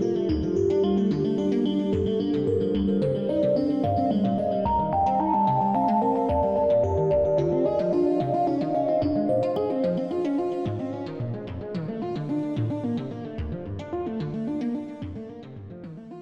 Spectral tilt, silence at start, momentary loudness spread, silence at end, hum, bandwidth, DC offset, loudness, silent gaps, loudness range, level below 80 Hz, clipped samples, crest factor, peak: -9 dB/octave; 0 s; 11 LU; 0 s; none; 8.2 kHz; under 0.1%; -25 LUFS; none; 8 LU; -46 dBFS; under 0.1%; 12 dB; -12 dBFS